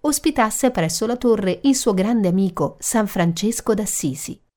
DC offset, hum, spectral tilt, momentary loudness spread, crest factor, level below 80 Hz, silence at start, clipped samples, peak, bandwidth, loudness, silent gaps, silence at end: under 0.1%; none; -4.5 dB/octave; 4 LU; 16 dB; -46 dBFS; 0.05 s; under 0.1%; -4 dBFS; 19.5 kHz; -20 LUFS; none; 0.2 s